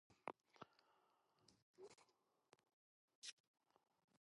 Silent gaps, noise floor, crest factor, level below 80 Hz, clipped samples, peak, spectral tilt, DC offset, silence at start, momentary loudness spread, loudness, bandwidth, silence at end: 1.62-1.74 s, 2.73-3.08 s, 3.15-3.22 s, 3.32-3.54 s, 4.04-4.08 s; -82 dBFS; 36 dB; under -90 dBFS; under 0.1%; -30 dBFS; -2 dB/octave; under 0.1%; 0.1 s; 8 LU; -61 LUFS; 11 kHz; 0.05 s